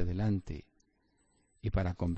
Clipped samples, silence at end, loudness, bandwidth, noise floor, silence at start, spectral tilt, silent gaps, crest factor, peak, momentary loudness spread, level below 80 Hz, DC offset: under 0.1%; 0 s; -35 LUFS; 8.2 kHz; -73 dBFS; 0 s; -9 dB/octave; none; 16 dB; -18 dBFS; 13 LU; -44 dBFS; under 0.1%